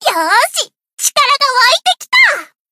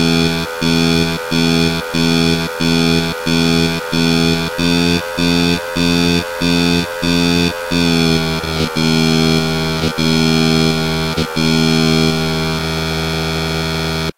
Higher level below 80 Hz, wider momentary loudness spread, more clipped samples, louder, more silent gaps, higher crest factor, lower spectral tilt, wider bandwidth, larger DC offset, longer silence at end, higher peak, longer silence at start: second, -64 dBFS vs -34 dBFS; first, 10 LU vs 5 LU; first, 0.1% vs under 0.1%; first, -10 LUFS vs -14 LUFS; first, 0.93-0.97 s vs none; about the same, 12 dB vs 14 dB; second, 2.5 dB/octave vs -5 dB/octave; about the same, 16.5 kHz vs 16 kHz; neither; first, 0.25 s vs 0.05 s; about the same, 0 dBFS vs -2 dBFS; about the same, 0 s vs 0 s